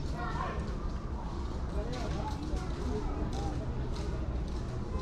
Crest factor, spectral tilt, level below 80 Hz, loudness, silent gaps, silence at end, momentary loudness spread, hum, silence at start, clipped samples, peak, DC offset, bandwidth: 14 dB; -7 dB/octave; -36 dBFS; -37 LUFS; none; 0 s; 3 LU; none; 0 s; under 0.1%; -22 dBFS; under 0.1%; 10 kHz